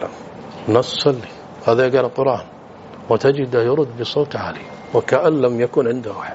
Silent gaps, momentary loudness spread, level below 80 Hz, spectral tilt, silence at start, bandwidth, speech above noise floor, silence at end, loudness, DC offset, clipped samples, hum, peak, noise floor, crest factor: none; 18 LU; -58 dBFS; -4.5 dB/octave; 0 s; 8 kHz; 20 dB; 0 s; -18 LUFS; under 0.1%; under 0.1%; none; 0 dBFS; -38 dBFS; 18 dB